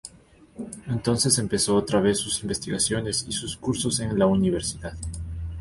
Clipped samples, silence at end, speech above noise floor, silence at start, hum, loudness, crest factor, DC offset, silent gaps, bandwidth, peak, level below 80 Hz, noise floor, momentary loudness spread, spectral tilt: under 0.1%; 0 s; 28 dB; 0.05 s; none; -24 LUFS; 18 dB; under 0.1%; none; 12 kHz; -8 dBFS; -42 dBFS; -53 dBFS; 13 LU; -4 dB/octave